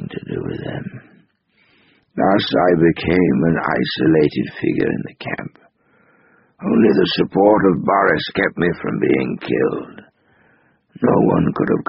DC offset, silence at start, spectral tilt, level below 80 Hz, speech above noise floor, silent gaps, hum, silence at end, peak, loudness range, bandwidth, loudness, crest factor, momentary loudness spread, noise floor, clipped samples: under 0.1%; 0 s; -5 dB/octave; -48 dBFS; 43 dB; none; none; 0.05 s; 0 dBFS; 4 LU; 5.8 kHz; -17 LUFS; 18 dB; 13 LU; -59 dBFS; under 0.1%